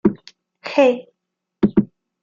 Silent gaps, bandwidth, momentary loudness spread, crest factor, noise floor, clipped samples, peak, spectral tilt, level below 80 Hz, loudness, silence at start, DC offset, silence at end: none; 7.4 kHz; 18 LU; 18 dB; -79 dBFS; under 0.1%; -2 dBFS; -7.5 dB/octave; -50 dBFS; -19 LUFS; 0.05 s; under 0.1%; 0.35 s